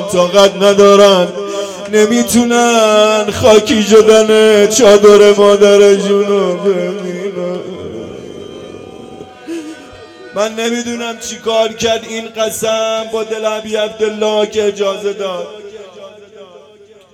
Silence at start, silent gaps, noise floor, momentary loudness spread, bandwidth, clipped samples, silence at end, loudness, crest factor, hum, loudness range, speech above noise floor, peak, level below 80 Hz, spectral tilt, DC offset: 0 s; none; -41 dBFS; 20 LU; 15.5 kHz; 2%; 0.7 s; -10 LUFS; 12 dB; none; 15 LU; 31 dB; 0 dBFS; -50 dBFS; -3.5 dB/octave; under 0.1%